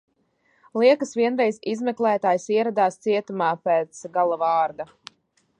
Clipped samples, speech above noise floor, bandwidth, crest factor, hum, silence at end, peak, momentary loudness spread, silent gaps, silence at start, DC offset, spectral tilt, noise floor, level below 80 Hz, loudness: under 0.1%; 44 dB; 10 kHz; 18 dB; none; 0.75 s; -4 dBFS; 8 LU; none; 0.75 s; under 0.1%; -5 dB/octave; -66 dBFS; -76 dBFS; -22 LUFS